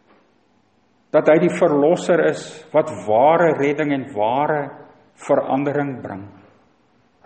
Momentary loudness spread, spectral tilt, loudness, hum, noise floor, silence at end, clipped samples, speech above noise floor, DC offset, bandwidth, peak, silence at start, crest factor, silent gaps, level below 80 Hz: 15 LU; -6.5 dB/octave; -18 LUFS; none; -60 dBFS; 0.95 s; under 0.1%; 43 dB; under 0.1%; 8.8 kHz; 0 dBFS; 1.15 s; 20 dB; none; -68 dBFS